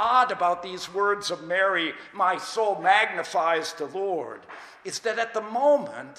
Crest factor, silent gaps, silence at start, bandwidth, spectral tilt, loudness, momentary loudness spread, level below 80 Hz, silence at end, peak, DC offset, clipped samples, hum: 18 dB; none; 0 s; 15 kHz; -2.5 dB/octave; -25 LUFS; 11 LU; -72 dBFS; 0.05 s; -8 dBFS; under 0.1%; under 0.1%; none